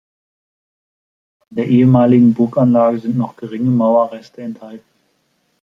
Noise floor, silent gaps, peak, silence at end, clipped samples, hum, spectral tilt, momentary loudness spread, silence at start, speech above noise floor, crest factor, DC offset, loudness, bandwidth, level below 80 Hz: -63 dBFS; none; -2 dBFS; 0.85 s; under 0.1%; none; -10.5 dB/octave; 19 LU; 1.5 s; 50 dB; 14 dB; under 0.1%; -14 LUFS; 5.6 kHz; -58 dBFS